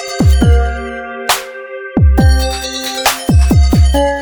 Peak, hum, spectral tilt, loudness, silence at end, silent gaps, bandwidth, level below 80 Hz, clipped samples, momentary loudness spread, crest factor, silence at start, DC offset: 0 dBFS; none; -5 dB/octave; -12 LUFS; 0 s; none; over 20 kHz; -14 dBFS; under 0.1%; 11 LU; 12 dB; 0 s; under 0.1%